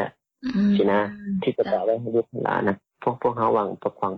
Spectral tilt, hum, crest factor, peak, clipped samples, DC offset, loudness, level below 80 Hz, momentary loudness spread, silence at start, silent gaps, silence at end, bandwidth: -9 dB/octave; none; 14 dB; -10 dBFS; under 0.1%; under 0.1%; -24 LUFS; -60 dBFS; 8 LU; 0 s; none; 0 s; 6 kHz